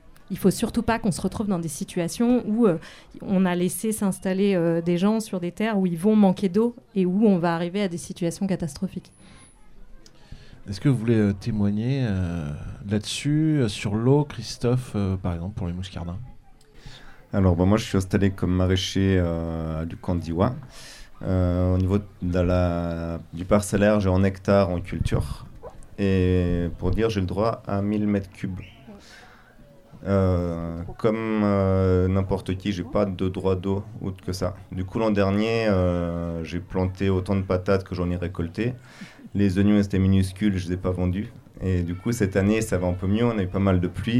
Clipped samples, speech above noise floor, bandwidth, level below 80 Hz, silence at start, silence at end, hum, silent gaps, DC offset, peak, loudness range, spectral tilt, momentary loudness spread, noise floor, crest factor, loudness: under 0.1%; 27 dB; 14.5 kHz; -42 dBFS; 0.1 s; 0 s; none; none; under 0.1%; -6 dBFS; 4 LU; -7 dB/octave; 12 LU; -50 dBFS; 18 dB; -24 LUFS